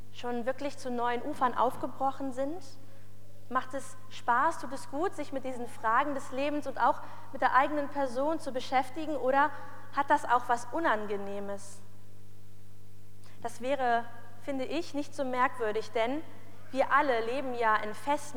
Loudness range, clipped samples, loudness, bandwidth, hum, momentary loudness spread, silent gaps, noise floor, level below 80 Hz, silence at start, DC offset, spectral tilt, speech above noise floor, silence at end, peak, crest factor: 6 LU; under 0.1%; -31 LUFS; over 20 kHz; 50 Hz at -55 dBFS; 12 LU; none; -55 dBFS; -74 dBFS; 0.05 s; 2%; -4.5 dB/octave; 24 dB; 0 s; -10 dBFS; 22 dB